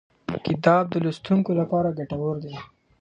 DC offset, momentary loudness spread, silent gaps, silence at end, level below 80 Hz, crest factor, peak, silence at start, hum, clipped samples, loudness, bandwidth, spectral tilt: under 0.1%; 13 LU; none; 0.35 s; -56 dBFS; 22 dB; -2 dBFS; 0.3 s; none; under 0.1%; -24 LUFS; 8.2 kHz; -8.5 dB/octave